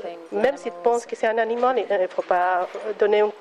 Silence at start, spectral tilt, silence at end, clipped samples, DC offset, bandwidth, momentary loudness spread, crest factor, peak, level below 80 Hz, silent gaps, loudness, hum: 0 s; -4 dB/octave; 0 s; under 0.1%; under 0.1%; 11 kHz; 5 LU; 14 dB; -8 dBFS; -70 dBFS; none; -23 LUFS; none